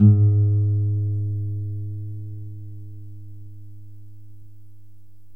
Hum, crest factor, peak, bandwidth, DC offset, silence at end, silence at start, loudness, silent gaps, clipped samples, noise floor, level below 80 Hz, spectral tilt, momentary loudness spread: none; 18 dB; -4 dBFS; 1.3 kHz; 1%; 1.3 s; 0 s; -23 LUFS; none; under 0.1%; -53 dBFS; -56 dBFS; -13.5 dB/octave; 26 LU